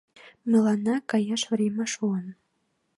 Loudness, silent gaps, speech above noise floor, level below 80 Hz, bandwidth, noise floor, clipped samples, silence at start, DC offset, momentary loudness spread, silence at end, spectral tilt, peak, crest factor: -26 LUFS; none; 49 dB; -74 dBFS; 11.5 kHz; -74 dBFS; under 0.1%; 0.25 s; under 0.1%; 11 LU; 0.65 s; -5 dB/octave; -10 dBFS; 16 dB